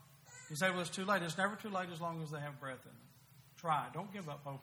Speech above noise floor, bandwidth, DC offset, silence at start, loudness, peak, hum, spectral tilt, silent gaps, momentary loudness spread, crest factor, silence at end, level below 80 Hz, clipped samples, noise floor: 22 dB; over 20 kHz; under 0.1%; 0 s; -39 LUFS; -20 dBFS; none; -4.5 dB/octave; none; 13 LU; 20 dB; 0 s; -80 dBFS; under 0.1%; -62 dBFS